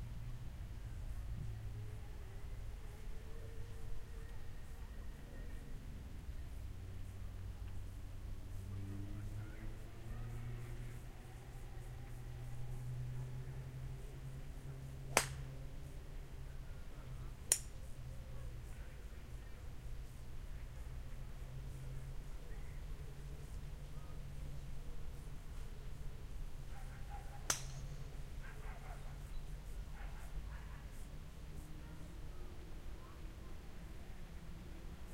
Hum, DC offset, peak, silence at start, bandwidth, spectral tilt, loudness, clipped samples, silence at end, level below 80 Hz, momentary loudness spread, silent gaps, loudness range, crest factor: none; under 0.1%; -10 dBFS; 0 s; 16 kHz; -3.5 dB/octave; -49 LUFS; under 0.1%; 0 s; -50 dBFS; 7 LU; none; 8 LU; 36 dB